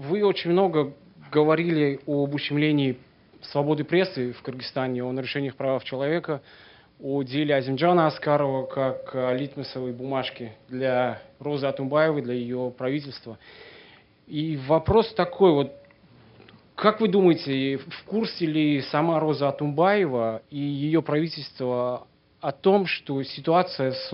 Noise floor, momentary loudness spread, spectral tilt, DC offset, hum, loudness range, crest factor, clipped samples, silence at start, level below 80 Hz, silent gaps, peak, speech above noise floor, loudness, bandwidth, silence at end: -53 dBFS; 12 LU; -9.5 dB/octave; under 0.1%; none; 4 LU; 22 dB; under 0.1%; 0 s; -56 dBFS; none; -4 dBFS; 29 dB; -25 LUFS; 5.8 kHz; 0 s